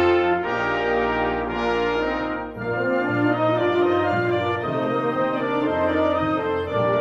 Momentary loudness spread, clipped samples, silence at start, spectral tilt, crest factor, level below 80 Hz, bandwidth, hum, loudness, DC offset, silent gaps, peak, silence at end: 4 LU; under 0.1%; 0 s; -7.5 dB/octave; 12 dB; -46 dBFS; 7.4 kHz; none; -22 LUFS; under 0.1%; none; -10 dBFS; 0 s